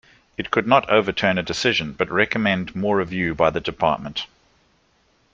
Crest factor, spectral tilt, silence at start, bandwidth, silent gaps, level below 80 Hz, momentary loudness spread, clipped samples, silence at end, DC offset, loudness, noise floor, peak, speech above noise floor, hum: 20 dB; -5 dB/octave; 0.4 s; 8.4 kHz; none; -50 dBFS; 11 LU; under 0.1%; 1.1 s; under 0.1%; -21 LUFS; -62 dBFS; -2 dBFS; 41 dB; none